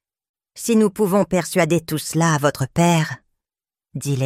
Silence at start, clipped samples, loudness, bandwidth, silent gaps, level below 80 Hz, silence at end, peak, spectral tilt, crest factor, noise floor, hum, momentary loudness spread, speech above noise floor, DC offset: 0.55 s; under 0.1%; -19 LUFS; 16 kHz; none; -54 dBFS; 0 s; -2 dBFS; -5.5 dB/octave; 18 dB; under -90 dBFS; none; 11 LU; over 72 dB; under 0.1%